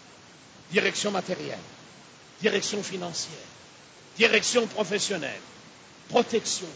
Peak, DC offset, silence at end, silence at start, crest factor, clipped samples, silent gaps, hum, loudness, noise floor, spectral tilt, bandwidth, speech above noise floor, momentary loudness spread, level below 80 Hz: -6 dBFS; under 0.1%; 0 s; 0 s; 22 dB; under 0.1%; none; none; -26 LUFS; -51 dBFS; -2.5 dB/octave; 8 kHz; 24 dB; 22 LU; -70 dBFS